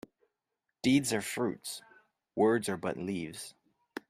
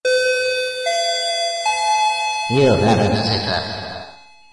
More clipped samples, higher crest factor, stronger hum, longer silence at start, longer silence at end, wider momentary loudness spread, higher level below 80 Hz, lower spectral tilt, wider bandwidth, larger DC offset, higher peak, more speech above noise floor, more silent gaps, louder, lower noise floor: neither; about the same, 18 dB vs 16 dB; neither; first, 0.85 s vs 0.05 s; second, 0.1 s vs 0.35 s; first, 17 LU vs 8 LU; second, -70 dBFS vs -50 dBFS; about the same, -4.5 dB/octave vs -4 dB/octave; first, 15.5 kHz vs 11.5 kHz; neither; second, -16 dBFS vs -2 dBFS; first, 55 dB vs 26 dB; neither; second, -32 LUFS vs -18 LUFS; first, -86 dBFS vs -42 dBFS